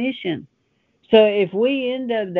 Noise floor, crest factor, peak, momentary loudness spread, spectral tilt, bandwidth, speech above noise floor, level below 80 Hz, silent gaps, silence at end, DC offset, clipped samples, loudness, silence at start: -65 dBFS; 18 dB; -2 dBFS; 13 LU; -8 dB/octave; 4.5 kHz; 47 dB; -66 dBFS; none; 0 s; under 0.1%; under 0.1%; -19 LUFS; 0 s